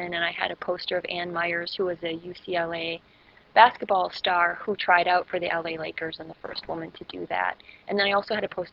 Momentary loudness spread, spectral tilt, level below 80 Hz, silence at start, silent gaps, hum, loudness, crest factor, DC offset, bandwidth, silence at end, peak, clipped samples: 15 LU; -6 dB/octave; -64 dBFS; 0 s; none; none; -26 LUFS; 26 dB; under 0.1%; 7.2 kHz; 0.05 s; -2 dBFS; under 0.1%